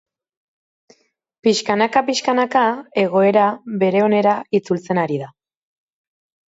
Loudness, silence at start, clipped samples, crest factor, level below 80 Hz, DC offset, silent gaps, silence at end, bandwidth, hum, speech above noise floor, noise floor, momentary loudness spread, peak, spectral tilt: -18 LUFS; 1.45 s; under 0.1%; 18 dB; -68 dBFS; under 0.1%; none; 1.2 s; 8 kHz; none; 39 dB; -56 dBFS; 6 LU; -2 dBFS; -5 dB/octave